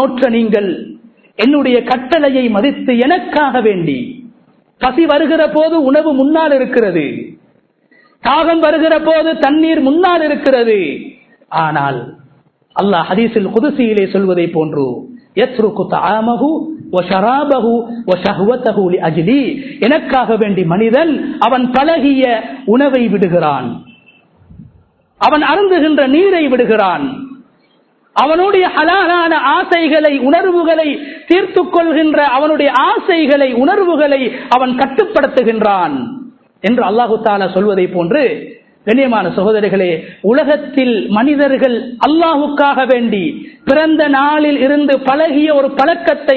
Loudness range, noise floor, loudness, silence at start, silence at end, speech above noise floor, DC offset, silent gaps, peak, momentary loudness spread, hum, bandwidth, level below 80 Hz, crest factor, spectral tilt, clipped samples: 3 LU; -53 dBFS; -12 LUFS; 0 s; 0 s; 42 dB; under 0.1%; none; 0 dBFS; 7 LU; none; 6.4 kHz; -50 dBFS; 12 dB; -8 dB/octave; under 0.1%